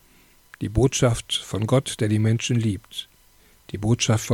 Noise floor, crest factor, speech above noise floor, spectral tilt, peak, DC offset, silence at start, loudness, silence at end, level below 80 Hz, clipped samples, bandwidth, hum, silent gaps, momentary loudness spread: -56 dBFS; 16 dB; 34 dB; -5 dB/octave; -8 dBFS; under 0.1%; 0.6 s; -23 LUFS; 0 s; -42 dBFS; under 0.1%; 15.5 kHz; none; none; 13 LU